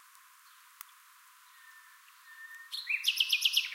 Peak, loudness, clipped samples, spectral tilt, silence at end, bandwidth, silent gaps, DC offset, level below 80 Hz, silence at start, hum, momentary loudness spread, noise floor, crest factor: -14 dBFS; -29 LUFS; under 0.1%; 11.5 dB/octave; 0 s; 16 kHz; none; under 0.1%; under -90 dBFS; 1.65 s; none; 25 LU; -59 dBFS; 22 dB